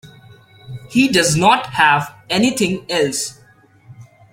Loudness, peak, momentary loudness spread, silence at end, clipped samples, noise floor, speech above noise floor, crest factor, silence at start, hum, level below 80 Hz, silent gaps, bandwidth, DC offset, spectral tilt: -16 LUFS; 0 dBFS; 11 LU; 0.3 s; under 0.1%; -48 dBFS; 33 dB; 18 dB; 0.05 s; none; -52 dBFS; none; 16.5 kHz; under 0.1%; -3.5 dB/octave